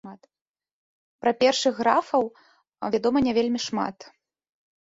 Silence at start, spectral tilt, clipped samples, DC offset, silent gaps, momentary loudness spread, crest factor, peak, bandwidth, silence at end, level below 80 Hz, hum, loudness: 0.05 s; -4 dB/octave; under 0.1%; under 0.1%; 0.42-0.54 s, 0.73-1.19 s; 9 LU; 22 dB; -4 dBFS; 8 kHz; 0.8 s; -62 dBFS; none; -24 LUFS